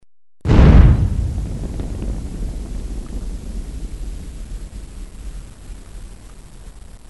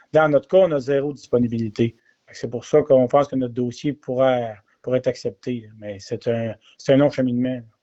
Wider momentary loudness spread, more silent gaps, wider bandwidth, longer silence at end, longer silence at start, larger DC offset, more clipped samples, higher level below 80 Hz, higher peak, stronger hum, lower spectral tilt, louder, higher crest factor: first, 26 LU vs 14 LU; neither; first, 11.5 kHz vs 8 kHz; second, 0 s vs 0.2 s; first, 0.45 s vs 0.15 s; first, 0.6% vs under 0.1%; neither; first, -20 dBFS vs -58 dBFS; first, 0 dBFS vs -4 dBFS; neither; about the same, -8 dB/octave vs -7 dB/octave; first, -18 LUFS vs -21 LUFS; about the same, 18 dB vs 16 dB